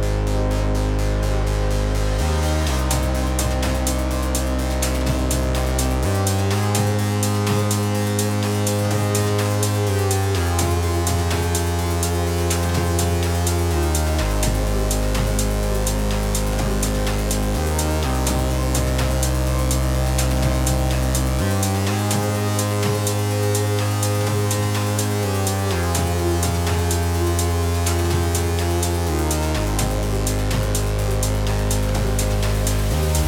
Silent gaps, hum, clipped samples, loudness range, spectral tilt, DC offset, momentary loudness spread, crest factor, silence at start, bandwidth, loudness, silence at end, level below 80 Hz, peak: none; none; under 0.1%; 1 LU; -5 dB/octave; under 0.1%; 2 LU; 14 dB; 0 s; 18.5 kHz; -21 LUFS; 0 s; -24 dBFS; -6 dBFS